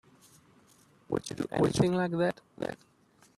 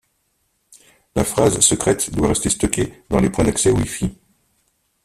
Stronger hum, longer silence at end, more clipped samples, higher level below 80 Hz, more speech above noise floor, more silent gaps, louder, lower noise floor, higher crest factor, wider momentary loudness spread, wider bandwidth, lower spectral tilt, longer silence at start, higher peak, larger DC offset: neither; second, 0.65 s vs 0.9 s; neither; second, -60 dBFS vs -36 dBFS; second, 32 dB vs 49 dB; neither; second, -31 LUFS vs -18 LUFS; second, -62 dBFS vs -67 dBFS; about the same, 20 dB vs 20 dB; first, 12 LU vs 9 LU; second, 13.5 kHz vs 15.5 kHz; first, -6 dB/octave vs -4 dB/octave; about the same, 1.1 s vs 1.15 s; second, -12 dBFS vs 0 dBFS; neither